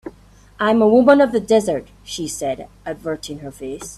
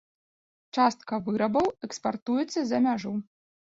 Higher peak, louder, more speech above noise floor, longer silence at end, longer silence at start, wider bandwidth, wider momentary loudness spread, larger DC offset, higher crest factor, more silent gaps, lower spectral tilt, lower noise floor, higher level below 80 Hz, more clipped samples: first, 0 dBFS vs -10 dBFS; first, -17 LUFS vs -28 LUFS; second, 29 dB vs over 63 dB; second, 0 s vs 0.55 s; second, 0.05 s vs 0.75 s; first, 14 kHz vs 7.8 kHz; first, 19 LU vs 8 LU; neither; about the same, 18 dB vs 18 dB; second, none vs 2.22-2.26 s; about the same, -5 dB/octave vs -5.5 dB/octave; second, -47 dBFS vs under -90 dBFS; first, -48 dBFS vs -66 dBFS; neither